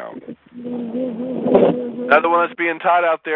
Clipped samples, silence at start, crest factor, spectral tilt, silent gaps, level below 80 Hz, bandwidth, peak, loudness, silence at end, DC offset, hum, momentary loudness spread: under 0.1%; 0 s; 18 dB; -9 dB/octave; none; -60 dBFS; 5.4 kHz; 0 dBFS; -18 LUFS; 0 s; under 0.1%; none; 19 LU